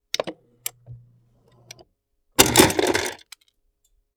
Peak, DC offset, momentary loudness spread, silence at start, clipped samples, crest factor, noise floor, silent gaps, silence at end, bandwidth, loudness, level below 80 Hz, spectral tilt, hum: 0 dBFS; under 0.1%; 20 LU; 0.2 s; under 0.1%; 24 dB; -70 dBFS; none; 1 s; over 20 kHz; -19 LUFS; -48 dBFS; -2.5 dB/octave; none